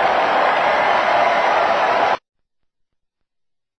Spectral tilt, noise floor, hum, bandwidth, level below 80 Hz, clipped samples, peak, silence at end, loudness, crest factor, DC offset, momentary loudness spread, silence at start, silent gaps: -3.5 dB/octave; -77 dBFS; none; 9 kHz; -56 dBFS; under 0.1%; -6 dBFS; 1.6 s; -16 LUFS; 14 dB; under 0.1%; 3 LU; 0 s; none